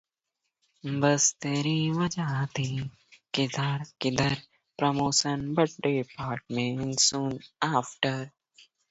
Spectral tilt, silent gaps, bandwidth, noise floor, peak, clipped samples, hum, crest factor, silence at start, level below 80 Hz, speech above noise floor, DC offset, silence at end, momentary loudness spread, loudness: -4 dB/octave; none; 8.2 kHz; -83 dBFS; -8 dBFS; under 0.1%; none; 22 dB; 0.85 s; -60 dBFS; 56 dB; under 0.1%; 0.3 s; 11 LU; -28 LUFS